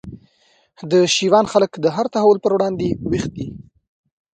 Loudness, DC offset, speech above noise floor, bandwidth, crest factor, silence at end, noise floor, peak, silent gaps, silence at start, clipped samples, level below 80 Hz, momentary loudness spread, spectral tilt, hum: -17 LUFS; under 0.1%; 41 dB; 9.4 kHz; 18 dB; 0.7 s; -59 dBFS; 0 dBFS; none; 0.05 s; under 0.1%; -48 dBFS; 13 LU; -5 dB/octave; none